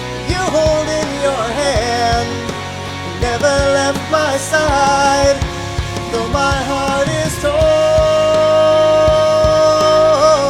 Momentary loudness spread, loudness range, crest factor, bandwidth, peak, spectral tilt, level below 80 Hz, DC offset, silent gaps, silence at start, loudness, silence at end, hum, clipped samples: 10 LU; 5 LU; 14 dB; 14.5 kHz; 0 dBFS; -4.5 dB/octave; -30 dBFS; under 0.1%; none; 0 s; -14 LUFS; 0 s; none; under 0.1%